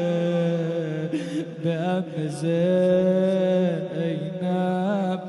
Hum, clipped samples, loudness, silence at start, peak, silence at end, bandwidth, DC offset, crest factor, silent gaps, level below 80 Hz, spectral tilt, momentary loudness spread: none; under 0.1%; -24 LUFS; 0 s; -10 dBFS; 0 s; 11.5 kHz; under 0.1%; 14 dB; none; -68 dBFS; -8 dB/octave; 8 LU